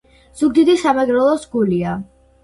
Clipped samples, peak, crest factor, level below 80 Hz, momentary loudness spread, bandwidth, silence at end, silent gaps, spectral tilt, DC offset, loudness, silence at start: under 0.1%; -4 dBFS; 14 dB; -50 dBFS; 8 LU; 11.5 kHz; 0.4 s; none; -6.5 dB/octave; under 0.1%; -16 LUFS; 0.35 s